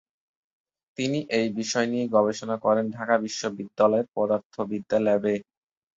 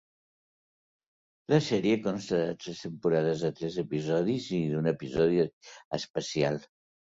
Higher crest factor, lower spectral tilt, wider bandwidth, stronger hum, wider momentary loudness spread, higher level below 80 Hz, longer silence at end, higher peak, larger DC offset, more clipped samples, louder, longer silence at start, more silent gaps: about the same, 20 dB vs 20 dB; second, -5 dB/octave vs -6.5 dB/octave; about the same, 8 kHz vs 7.8 kHz; neither; about the same, 9 LU vs 10 LU; second, -68 dBFS vs -62 dBFS; about the same, 0.55 s vs 0.45 s; first, -6 dBFS vs -10 dBFS; neither; neither; first, -25 LUFS vs -30 LUFS; second, 1 s vs 1.5 s; second, 4.46-4.50 s vs 5.53-5.61 s, 5.85-5.91 s, 6.10-6.14 s